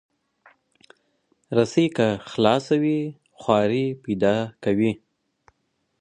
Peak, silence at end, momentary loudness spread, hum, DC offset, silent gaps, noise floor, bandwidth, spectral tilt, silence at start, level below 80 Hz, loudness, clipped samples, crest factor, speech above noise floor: -2 dBFS; 1.05 s; 7 LU; none; under 0.1%; none; -73 dBFS; 9.8 kHz; -6.5 dB/octave; 1.5 s; -60 dBFS; -23 LUFS; under 0.1%; 22 dB; 51 dB